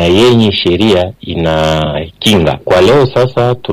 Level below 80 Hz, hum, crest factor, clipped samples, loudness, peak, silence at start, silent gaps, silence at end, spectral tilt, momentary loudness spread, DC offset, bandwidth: -32 dBFS; none; 8 dB; under 0.1%; -10 LUFS; -2 dBFS; 0 s; none; 0 s; -6 dB/octave; 7 LU; under 0.1%; 16 kHz